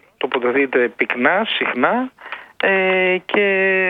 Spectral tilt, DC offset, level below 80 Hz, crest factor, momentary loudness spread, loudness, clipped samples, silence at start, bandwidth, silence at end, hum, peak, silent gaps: -7 dB/octave; under 0.1%; -64 dBFS; 18 dB; 8 LU; -17 LUFS; under 0.1%; 0.2 s; 4.8 kHz; 0 s; none; 0 dBFS; none